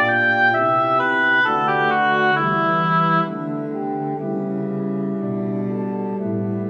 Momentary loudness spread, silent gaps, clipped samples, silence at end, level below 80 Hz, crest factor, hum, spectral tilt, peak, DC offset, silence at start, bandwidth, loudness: 9 LU; none; under 0.1%; 0 s; -72 dBFS; 14 dB; none; -7.5 dB/octave; -6 dBFS; under 0.1%; 0 s; 6.8 kHz; -19 LUFS